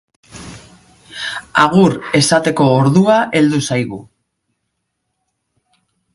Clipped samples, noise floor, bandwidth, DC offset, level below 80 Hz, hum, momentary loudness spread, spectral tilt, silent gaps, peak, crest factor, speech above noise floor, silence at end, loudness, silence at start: under 0.1%; -72 dBFS; 11.5 kHz; under 0.1%; -52 dBFS; none; 23 LU; -5.5 dB/octave; none; 0 dBFS; 16 dB; 59 dB; 2.1 s; -13 LUFS; 0.35 s